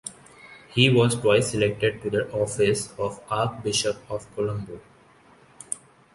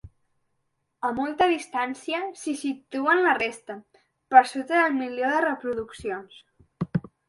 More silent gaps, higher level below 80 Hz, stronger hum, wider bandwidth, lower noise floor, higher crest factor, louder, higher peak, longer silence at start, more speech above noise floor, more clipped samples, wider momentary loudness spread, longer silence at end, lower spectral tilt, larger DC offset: neither; first, -54 dBFS vs -60 dBFS; neither; about the same, 11.5 kHz vs 11.5 kHz; second, -55 dBFS vs -75 dBFS; about the same, 20 dB vs 24 dB; about the same, -24 LUFS vs -25 LUFS; about the same, -4 dBFS vs -2 dBFS; about the same, 0.05 s vs 0.05 s; second, 31 dB vs 51 dB; neither; about the same, 15 LU vs 15 LU; about the same, 0.35 s vs 0.3 s; about the same, -4.5 dB/octave vs -5 dB/octave; neither